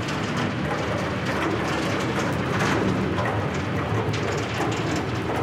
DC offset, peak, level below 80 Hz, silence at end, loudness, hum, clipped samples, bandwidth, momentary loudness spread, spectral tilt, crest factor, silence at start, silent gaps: under 0.1%; -10 dBFS; -46 dBFS; 0 s; -25 LUFS; none; under 0.1%; 16 kHz; 3 LU; -5.5 dB/octave; 14 dB; 0 s; none